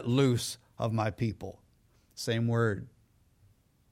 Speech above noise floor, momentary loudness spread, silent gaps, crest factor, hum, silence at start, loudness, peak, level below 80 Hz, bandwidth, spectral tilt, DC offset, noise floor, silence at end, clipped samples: 36 dB; 18 LU; none; 18 dB; none; 0 s; -31 LUFS; -14 dBFS; -62 dBFS; 16 kHz; -6 dB/octave; under 0.1%; -66 dBFS; 1.05 s; under 0.1%